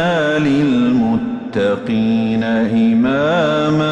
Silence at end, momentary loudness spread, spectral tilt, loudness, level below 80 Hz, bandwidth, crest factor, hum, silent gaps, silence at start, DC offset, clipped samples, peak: 0 s; 4 LU; -7 dB/octave; -15 LUFS; -48 dBFS; 8.4 kHz; 8 dB; none; none; 0 s; under 0.1%; under 0.1%; -6 dBFS